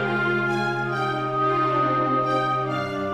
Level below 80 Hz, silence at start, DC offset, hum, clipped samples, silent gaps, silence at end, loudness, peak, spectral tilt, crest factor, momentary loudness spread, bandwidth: -60 dBFS; 0 s; 0.2%; none; under 0.1%; none; 0 s; -23 LUFS; -12 dBFS; -6.5 dB/octave; 12 dB; 4 LU; 10.5 kHz